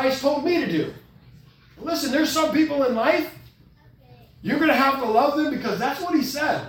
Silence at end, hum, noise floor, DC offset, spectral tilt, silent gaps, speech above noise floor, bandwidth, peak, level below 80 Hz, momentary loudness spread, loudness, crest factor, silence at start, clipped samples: 0 s; none; -53 dBFS; under 0.1%; -4.5 dB/octave; none; 31 dB; 18 kHz; -6 dBFS; -56 dBFS; 8 LU; -22 LUFS; 18 dB; 0 s; under 0.1%